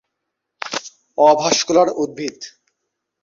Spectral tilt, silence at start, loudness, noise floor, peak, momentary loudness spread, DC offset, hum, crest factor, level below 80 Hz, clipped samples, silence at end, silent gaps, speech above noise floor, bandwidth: -2.5 dB/octave; 0.65 s; -17 LUFS; -78 dBFS; -2 dBFS; 18 LU; under 0.1%; none; 18 dB; -64 dBFS; under 0.1%; 0.75 s; none; 62 dB; 7.6 kHz